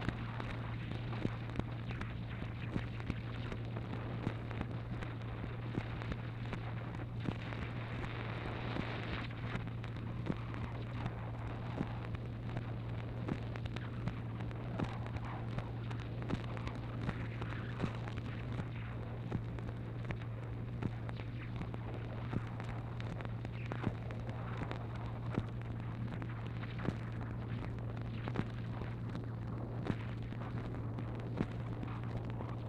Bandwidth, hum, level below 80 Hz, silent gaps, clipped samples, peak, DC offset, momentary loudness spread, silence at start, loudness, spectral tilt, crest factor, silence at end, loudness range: 7.4 kHz; none; -52 dBFS; none; under 0.1%; -18 dBFS; under 0.1%; 3 LU; 0 s; -42 LUFS; -8 dB/octave; 22 dB; 0 s; 1 LU